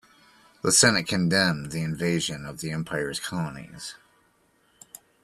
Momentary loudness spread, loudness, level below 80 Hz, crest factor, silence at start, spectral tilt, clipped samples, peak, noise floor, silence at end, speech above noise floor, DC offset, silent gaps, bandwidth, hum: 18 LU; -24 LUFS; -58 dBFS; 22 dB; 0.65 s; -3 dB/octave; under 0.1%; -4 dBFS; -65 dBFS; 1.3 s; 39 dB; under 0.1%; none; 14 kHz; none